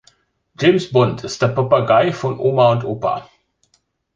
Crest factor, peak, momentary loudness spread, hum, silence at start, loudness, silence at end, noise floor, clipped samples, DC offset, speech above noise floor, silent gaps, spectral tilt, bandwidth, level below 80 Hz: 16 dB; -2 dBFS; 8 LU; none; 0.6 s; -17 LUFS; 0.95 s; -64 dBFS; under 0.1%; under 0.1%; 48 dB; none; -6.5 dB/octave; 7.6 kHz; -54 dBFS